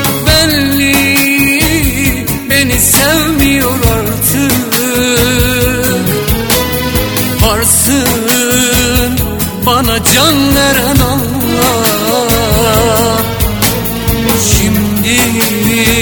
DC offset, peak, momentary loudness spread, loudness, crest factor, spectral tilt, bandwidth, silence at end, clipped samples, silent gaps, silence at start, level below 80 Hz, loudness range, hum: under 0.1%; 0 dBFS; 5 LU; -9 LUFS; 10 dB; -3.5 dB/octave; over 20 kHz; 0 s; 0.3%; none; 0 s; -22 dBFS; 2 LU; none